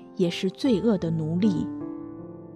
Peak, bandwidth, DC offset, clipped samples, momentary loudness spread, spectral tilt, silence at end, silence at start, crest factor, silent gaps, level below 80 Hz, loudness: -12 dBFS; 11 kHz; under 0.1%; under 0.1%; 15 LU; -7.5 dB/octave; 0 s; 0 s; 14 dB; none; -56 dBFS; -25 LUFS